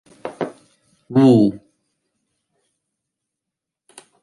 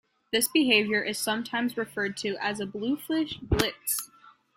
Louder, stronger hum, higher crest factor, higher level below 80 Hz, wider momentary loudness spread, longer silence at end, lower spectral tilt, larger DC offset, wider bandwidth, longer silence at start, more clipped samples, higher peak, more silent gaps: first, -17 LUFS vs -27 LUFS; neither; second, 18 dB vs 26 dB; second, -62 dBFS vs -46 dBFS; first, 17 LU vs 9 LU; first, 2.65 s vs 0.25 s; first, -8.5 dB/octave vs -3 dB/octave; neither; second, 11.5 kHz vs 16.5 kHz; about the same, 0.25 s vs 0.3 s; neither; about the same, -4 dBFS vs -4 dBFS; neither